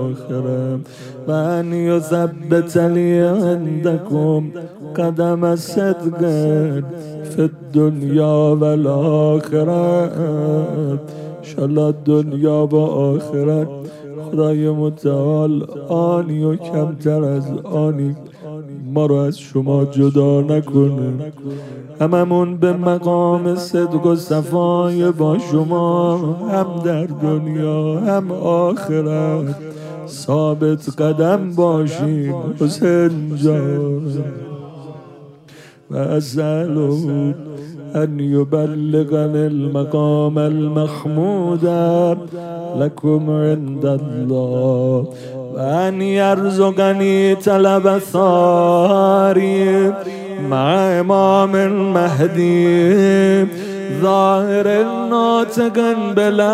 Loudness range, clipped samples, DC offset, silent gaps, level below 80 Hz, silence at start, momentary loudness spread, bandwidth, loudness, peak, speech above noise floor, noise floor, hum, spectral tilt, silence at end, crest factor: 5 LU; under 0.1%; under 0.1%; none; -66 dBFS; 0 s; 11 LU; 14.5 kHz; -16 LUFS; 0 dBFS; 27 dB; -42 dBFS; none; -8 dB/octave; 0 s; 16 dB